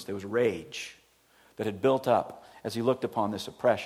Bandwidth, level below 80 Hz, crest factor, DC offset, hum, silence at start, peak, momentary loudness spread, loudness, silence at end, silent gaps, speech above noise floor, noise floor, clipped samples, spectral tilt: 15.5 kHz; -70 dBFS; 18 dB; under 0.1%; none; 0 s; -12 dBFS; 13 LU; -29 LUFS; 0 s; none; 34 dB; -62 dBFS; under 0.1%; -5.5 dB/octave